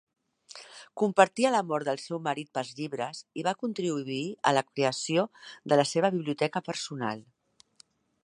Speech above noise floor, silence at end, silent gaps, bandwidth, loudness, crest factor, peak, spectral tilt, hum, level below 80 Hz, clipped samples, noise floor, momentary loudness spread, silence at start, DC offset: 34 dB; 1 s; none; 11.5 kHz; -29 LUFS; 24 dB; -4 dBFS; -4.5 dB/octave; none; -78 dBFS; under 0.1%; -62 dBFS; 13 LU; 0.55 s; under 0.1%